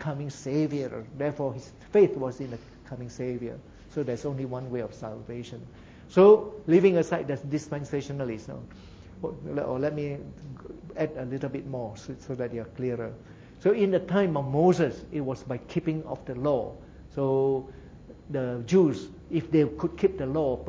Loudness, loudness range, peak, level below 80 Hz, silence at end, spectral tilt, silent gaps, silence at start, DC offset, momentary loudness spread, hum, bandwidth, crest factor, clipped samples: -27 LUFS; 10 LU; -6 dBFS; -54 dBFS; 0 s; -8 dB/octave; none; 0 s; under 0.1%; 18 LU; none; 7.8 kHz; 22 dB; under 0.1%